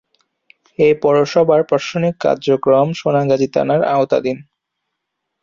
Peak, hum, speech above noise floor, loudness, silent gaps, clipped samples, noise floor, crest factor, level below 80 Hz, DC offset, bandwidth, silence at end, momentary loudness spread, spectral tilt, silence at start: -2 dBFS; none; 62 dB; -15 LUFS; none; under 0.1%; -76 dBFS; 14 dB; -58 dBFS; under 0.1%; 7.4 kHz; 1 s; 5 LU; -6.5 dB/octave; 0.8 s